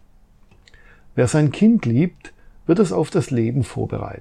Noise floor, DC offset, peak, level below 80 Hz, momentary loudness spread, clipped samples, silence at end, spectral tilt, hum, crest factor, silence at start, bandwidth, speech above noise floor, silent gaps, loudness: -50 dBFS; under 0.1%; -2 dBFS; -48 dBFS; 11 LU; under 0.1%; 0.05 s; -7.5 dB/octave; none; 18 dB; 1.15 s; 11 kHz; 32 dB; none; -19 LUFS